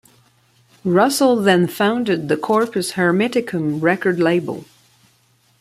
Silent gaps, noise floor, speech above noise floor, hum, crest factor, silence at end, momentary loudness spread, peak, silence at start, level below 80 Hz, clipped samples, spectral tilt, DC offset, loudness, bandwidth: none; -58 dBFS; 41 dB; none; 16 dB; 1 s; 7 LU; -2 dBFS; 0.85 s; -62 dBFS; under 0.1%; -5.5 dB/octave; under 0.1%; -17 LUFS; 16 kHz